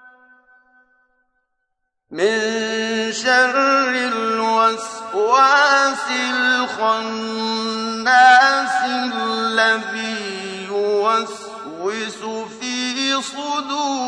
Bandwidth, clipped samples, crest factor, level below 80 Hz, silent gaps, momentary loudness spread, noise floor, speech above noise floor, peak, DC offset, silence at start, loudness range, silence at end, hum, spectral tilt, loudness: 10.5 kHz; under 0.1%; 18 dB; -68 dBFS; none; 14 LU; -74 dBFS; 56 dB; -2 dBFS; under 0.1%; 0.05 s; 6 LU; 0 s; none; -2 dB/octave; -17 LUFS